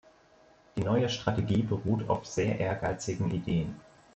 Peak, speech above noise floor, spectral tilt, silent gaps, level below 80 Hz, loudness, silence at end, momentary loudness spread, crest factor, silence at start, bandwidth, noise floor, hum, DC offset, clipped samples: -12 dBFS; 31 dB; -6.5 dB/octave; none; -54 dBFS; -31 LUFS; 0.35 s; 6 LU; 20 dB; 0.75 s; 8.4 kHz; -60 dBFS; none; under 0.1%; under 0.1%